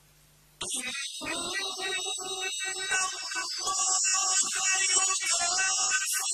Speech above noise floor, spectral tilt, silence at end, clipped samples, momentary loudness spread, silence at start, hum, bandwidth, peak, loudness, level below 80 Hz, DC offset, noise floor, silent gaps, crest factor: 32 dB; 2 dB/octave; 0 s; under 0.1%; 9 LU; 0.6 s; none; 14 kHz; -10 dBFS; -26 LUFS; -68 dBFS; under 0.1%; -60 dBFS; none; 20 dB